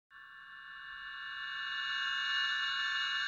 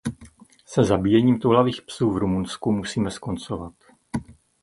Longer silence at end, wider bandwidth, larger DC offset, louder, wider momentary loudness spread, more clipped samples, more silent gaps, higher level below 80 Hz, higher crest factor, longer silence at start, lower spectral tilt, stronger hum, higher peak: second, 0 s vs 0.3 s; second, 10 kHz vs 11.5 kHz; neither; second, -34 LUFS vs -23 LUFS; first, 18 LU vs 15 LU; neither; neither; second, -76 dBFS vs -46 dBFS; about the same, 16 dB vs 20 dB; about the same, 0.1 s vs 0.05 s; second, 2.5 dB/octave vs -6.5 dB/octave; neither; second, -22 dBFS vs -4 dBFS